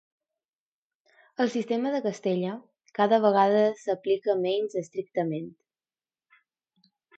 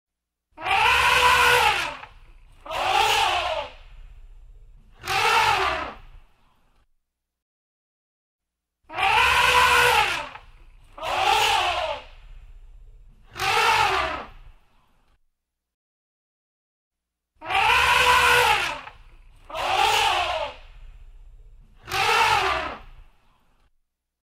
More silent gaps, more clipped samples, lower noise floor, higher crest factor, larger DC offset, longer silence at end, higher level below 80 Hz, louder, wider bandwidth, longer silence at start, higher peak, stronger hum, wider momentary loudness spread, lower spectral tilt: second, none vs 7.42-8.39 s, 15.74-16.91 s; neither; first, under -90 dBFS vs -74 dBFS; about the same, 20 dB vs 20 dB; neither; first, 1.7 s vs 1.3 s; second, -80 dBFS vs -46 dBFS; second, -26 LUFS vs -20 LUFS; second, 8.2 kHz vs 16 kHz; first, 1.4 s vs 0.6 s; second, -8 dBFS vs -4 dBFS; neither; second, 14 LU vs 18 LU; first, -6.5 dB/octave vs -1 dB/octave